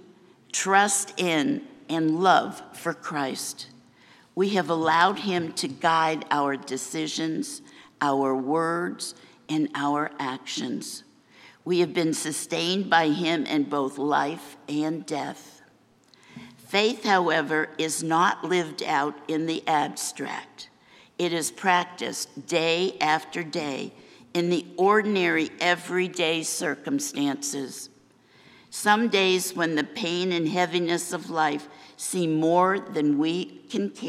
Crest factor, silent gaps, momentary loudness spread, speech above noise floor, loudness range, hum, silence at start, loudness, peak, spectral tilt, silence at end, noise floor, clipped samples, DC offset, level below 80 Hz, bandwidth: 22 dB; none; 13 LU; 34 dB; 4 LU; none; 0.55 s; -25 LUFS; -4 dBFS; -3.5 dB/octave; 0 s; -59 dBFS; under 0.1%; under 0.1%; -80 dBFS; 15.5 kHz